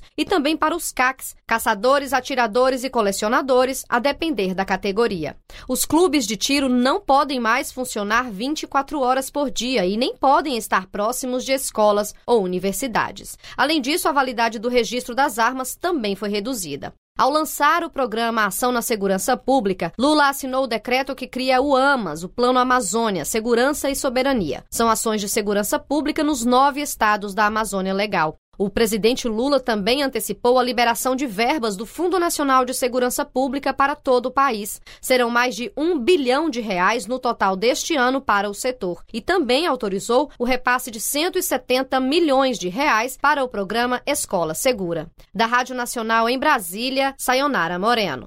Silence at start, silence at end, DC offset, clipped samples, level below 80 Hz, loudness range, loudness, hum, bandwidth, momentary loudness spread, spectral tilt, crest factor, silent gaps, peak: 0 s; 0 s; under 0.1%; under 0.1%; -48 dBFS; 2 LU; -20 LUFS; none; 16 kHz; 6 LU; -3 dB/octave; 16 dB; 16.98-17.15 s, 28.38-28.52 s; -6 dBFS